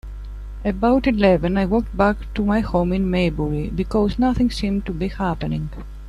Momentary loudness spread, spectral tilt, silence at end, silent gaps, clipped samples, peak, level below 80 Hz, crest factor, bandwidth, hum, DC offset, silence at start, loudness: 10 LU; -8 dB/octave; 0 s; none; under 0.1%; -4 dBFS; -30 dBFS; 16 dB; 11 kHz; 50 Hz at -30 dBFS; under 0.1%; 0.05 s; -20 LUFS